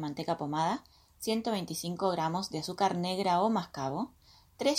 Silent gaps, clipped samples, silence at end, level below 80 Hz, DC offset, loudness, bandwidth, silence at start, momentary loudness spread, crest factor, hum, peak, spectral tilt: none; under 0.1%; 0 s; -66 dBFS; under 0.1%; -32 LUFS; 16.5 kHz; 0 s; 8 LU; 18 dB; none; -14 dBFS; -5 dB/octave